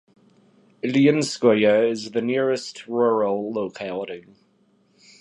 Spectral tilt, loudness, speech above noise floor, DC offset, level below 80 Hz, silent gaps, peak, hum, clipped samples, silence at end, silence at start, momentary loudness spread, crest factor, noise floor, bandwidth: -5.5 dB/octave; -22 LUFS; 41 dB; under 0.1%; -70 dBFS; none; -4 dBFS; none; under 0.1%; 1 s; 0.85 s; 13 LU; 18 dB; -62 dBFS; 11.5 kHz